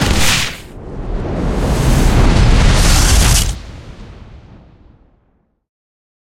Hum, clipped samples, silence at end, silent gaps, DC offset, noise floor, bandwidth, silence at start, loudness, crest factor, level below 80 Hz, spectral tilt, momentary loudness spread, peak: none; under 0.1%; 1.9 s; none; under 0.1%; -59 dBFS; 16.5 kHz; 0 s; -13 LUFS; 14 dB; -16 dBFS; -4 dB/octave; 20 LU; 0 dBFS